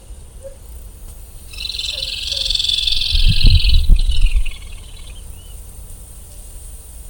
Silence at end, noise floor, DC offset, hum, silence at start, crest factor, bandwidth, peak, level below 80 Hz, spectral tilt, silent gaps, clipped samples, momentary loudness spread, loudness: 0 s; -35 dBFS; under 0.1%; none; 0.1 s; 16 dB; 17.5 kHz; 0 dBFS; -18 dBFS; -3 dB/octave; none; 0.2%; 23 LU; -17 LUFS